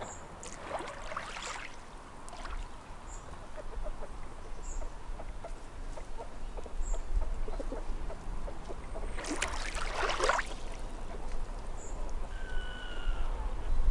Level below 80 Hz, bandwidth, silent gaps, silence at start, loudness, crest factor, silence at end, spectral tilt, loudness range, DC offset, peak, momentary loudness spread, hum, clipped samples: -38 dBFS; 11.5 kHz; none; 0 s; -40 LUFS; 22 dB; 0 s; -3.5 dB/octave; 10 LU; under 0.1%; -14 dBFS; 12 LU; none; under 0.1%